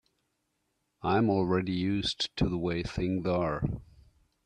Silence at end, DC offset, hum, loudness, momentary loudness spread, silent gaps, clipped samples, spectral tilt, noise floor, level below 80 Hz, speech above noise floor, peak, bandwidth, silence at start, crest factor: 0.65 s; under 0.1%; none; -30 LUFS; 7 LU; none; under 0.1%; -6.5 dB/octave; -79 dBFS; -48 dBFS; 49 dB; -14 dBFS; 9.8 kHz; 1.05 s; 18 dB